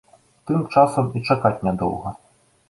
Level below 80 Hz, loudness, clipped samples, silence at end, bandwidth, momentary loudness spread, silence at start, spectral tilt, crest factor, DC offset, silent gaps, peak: -50 dBFS; -21 LUFS; under 0.1%; 0.55 s; 11.5 kHz; 14 LU; 0.45 s; -7.5 dB/octave; 20 dB; under 0.1%; none; -2 dBFS